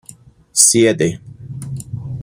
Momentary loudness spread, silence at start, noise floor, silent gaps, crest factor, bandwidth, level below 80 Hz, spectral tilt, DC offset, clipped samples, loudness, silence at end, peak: 22 LU; 0.55 s; -43 dBFS; none; 18 dB; 16.5 kHz; -48 dBFS; -3.5 dB/octave; under 0.1%; under 0.1%; -13 LUFS; 0 s; 0 dBFS